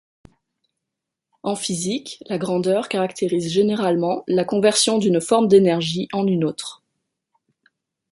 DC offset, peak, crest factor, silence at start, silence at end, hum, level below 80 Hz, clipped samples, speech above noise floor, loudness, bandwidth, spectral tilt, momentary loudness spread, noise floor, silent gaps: under 0.1%; -4 dBFS; 18 dB; 1.45 s; 1.35 s; none; -64 dBFS; under 0.1%; 64 dB; -20 LUFS; 11.5 kHz; -4.5 dB/octave; 12 LU; -83 dBFS; none